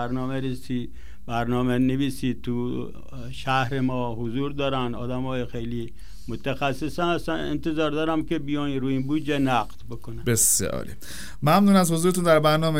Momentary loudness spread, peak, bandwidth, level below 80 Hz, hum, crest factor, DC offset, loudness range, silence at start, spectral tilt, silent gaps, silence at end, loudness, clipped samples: 18 LU; -4 dBFS; 16 kHz; -44 dBFS; none; 20 dB; 2%; 6 LU; 0 s; -5 dB/octave; none; 0 s; -24 LUFS; under 0.1%